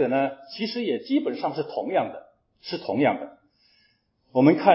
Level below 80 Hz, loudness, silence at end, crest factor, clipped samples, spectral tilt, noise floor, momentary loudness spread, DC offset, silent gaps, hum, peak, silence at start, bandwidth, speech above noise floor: -72 dBFS; -25 LUFS; 0 s; 22 dB; under 0.1%; -9 dB/octave; -66 dBFS; 14 LU; under 0.1%; none; none; -4 dBFS; 0 s; 5.8 kHz; 43 dB